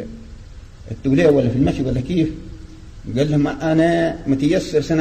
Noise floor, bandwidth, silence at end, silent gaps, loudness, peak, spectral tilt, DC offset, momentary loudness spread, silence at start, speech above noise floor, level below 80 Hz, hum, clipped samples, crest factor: -37 dBFS; 9.4 kHz; 0 s; none; -18 LUFS; -6 dBFS; -7.5 dB/octave; under 0.1%; 20 LU; 0 s; 20 dB; -36 dBFS; none; under 0.1%; 14 dB